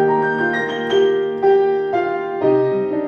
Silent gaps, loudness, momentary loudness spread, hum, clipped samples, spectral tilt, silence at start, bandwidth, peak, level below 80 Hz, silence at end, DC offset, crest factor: none; -17 LUFS; 5 LU; none; under 0.1%; -6.5 dB/octave; 0 s; 6.8 kHz; -4 dBFS; -62 dBFS; 0 s; under 0.1%; 12 dB